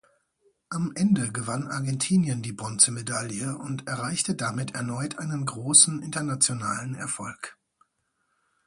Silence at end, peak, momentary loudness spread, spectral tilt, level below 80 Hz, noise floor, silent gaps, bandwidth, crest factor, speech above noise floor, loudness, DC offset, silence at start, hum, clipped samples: 1.15 s; -4 dBFS; 13 LU; -3.5 dB/octave; -64 dBFS; -75 dBFS; none; 11.5 kHz; 24 dB; 48 dB; -25 LUFS; under 0.1%; 0.7 s; none; under 0.1%